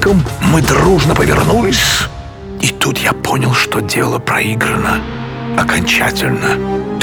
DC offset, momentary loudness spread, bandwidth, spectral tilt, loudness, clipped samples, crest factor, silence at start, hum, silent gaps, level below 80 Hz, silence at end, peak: under 0.1%; 8 LU; over 20 kHz; -4.5 dB/octave; -13 LUFS; under 0.1%; 14 dB; 0 s; none; none; -28 dBFS; 0 s; 0 dBFS